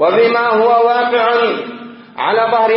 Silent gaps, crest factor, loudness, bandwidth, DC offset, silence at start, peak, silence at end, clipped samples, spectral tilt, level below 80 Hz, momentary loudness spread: none; 12 dB; -13 LUFS; 5.8 kHz; under 0.1%; 0 s; -2 dBFS; 0 s; under 0.1%; -9 dB/octave; -74 dBFS; 15 LU